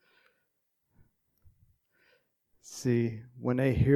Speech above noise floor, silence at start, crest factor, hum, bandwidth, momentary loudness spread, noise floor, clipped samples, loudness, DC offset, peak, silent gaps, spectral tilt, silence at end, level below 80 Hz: 52 dB; 2.65 s; 22 dB; none; 14 kHz; 9 LU; -79 dBFS; under 0.1%; -31 LUFS; under 0.1%; -12 dBFS; none; -7.5 dB/octave; 0 s; -50 dBFS